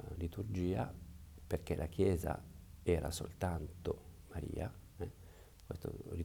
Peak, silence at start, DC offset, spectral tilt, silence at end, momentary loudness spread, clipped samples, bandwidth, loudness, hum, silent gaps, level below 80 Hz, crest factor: -20 dBFS; 0 s; under 0.1%; -6.5 dB/octave; 0 s; 19 LU; under 0.1%; over 20 kHz; -41 LUFS; none; none; -54 dBFS; 20 dB